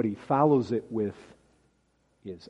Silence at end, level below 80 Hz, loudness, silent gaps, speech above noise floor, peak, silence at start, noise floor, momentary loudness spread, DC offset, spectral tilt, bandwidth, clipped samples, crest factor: 0.15 s; -68 dBFS; -27 LUFS; none; 42 dB; -10 dBFS; 0 s; -70 dBFS; 19 LU; under 0.1%; -9 dB/octave; 9.2 kHz; under 0.1%; 20 dB